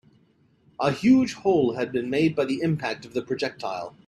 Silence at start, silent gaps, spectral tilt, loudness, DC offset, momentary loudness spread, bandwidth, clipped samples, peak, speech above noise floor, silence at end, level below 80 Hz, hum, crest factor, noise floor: 0.8 s; none; -6.5 dB/octave; -24 LUFS; under 0.1%; 10 LU; 11.5 kHz; under 0.1%; -8 dBFS; 38 dB; 0.2 s; -62 dBFS; none; 16 dB; -62 dBFS